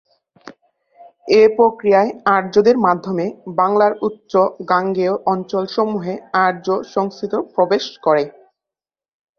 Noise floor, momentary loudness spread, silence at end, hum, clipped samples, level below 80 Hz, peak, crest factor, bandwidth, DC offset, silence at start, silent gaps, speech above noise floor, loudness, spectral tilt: -89 dBFS; 9 LU; 1.1 s; none; under 0.1%; -62 dBFS; 0 dBFS; 18 dB; 6.8 kHz; under 0.1%; 0.45 s; none; 73 dB; -17 LUFS; -6.5 dB/octave